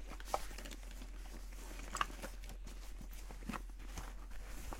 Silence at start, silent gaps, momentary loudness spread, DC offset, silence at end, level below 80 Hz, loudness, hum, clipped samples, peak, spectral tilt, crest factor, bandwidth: 0 s; none; 11 LU; under 0.1%; 0 s; -48 dBFS; -48 LUFS; none; under 0.1%; -18 dBFS; -3.5 dB/octave; 28 dB; 16.5 kHz